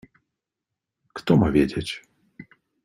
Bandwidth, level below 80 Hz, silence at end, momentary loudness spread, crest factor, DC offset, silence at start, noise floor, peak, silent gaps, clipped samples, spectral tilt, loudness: 13.5 kHz; -46 dBFS; 0.4 s; 18 LU; 22 dB; under 0.1%; 1.15 s; -85 dBFS; -4 dBFS; none; under 0.1%; -7 dB/octave; -22 LUFS